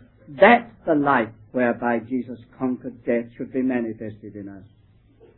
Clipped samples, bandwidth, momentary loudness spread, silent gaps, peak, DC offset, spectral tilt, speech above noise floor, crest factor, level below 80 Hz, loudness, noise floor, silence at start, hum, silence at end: under 0.1%; 4.2 kHz; 22 LU; none; -2 dBFS; under 0.1%; -10 dB/octave; 32 dB; 22 dB; -60 dBFS; -22 LUFS; -54 dBFS; 0.3 s; none; 0.8 s